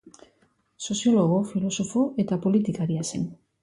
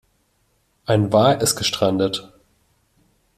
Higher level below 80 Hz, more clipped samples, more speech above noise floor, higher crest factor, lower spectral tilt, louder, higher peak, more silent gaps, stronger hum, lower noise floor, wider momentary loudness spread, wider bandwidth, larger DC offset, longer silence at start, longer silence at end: second, -62 dBFS vs -54 dBFS; neither; second, 42 dB vs 47 dB; about the same, 14 dB vs 18 dB; first, -6 dB/octave vs -4.5 dB/octave; second, -25 LUFS vs -19 LUFS; second, -10 dBFS vs -2 dBFS; neither; neither; about the same, -66 dBFS vs -65 dBFS; about the same, 10 LU vs 11 LU; second, 11.5 kHz vs 16 kHz; neither; second, 0.05 s vs 0.9 s; second, 0.3 s vs 1.1 s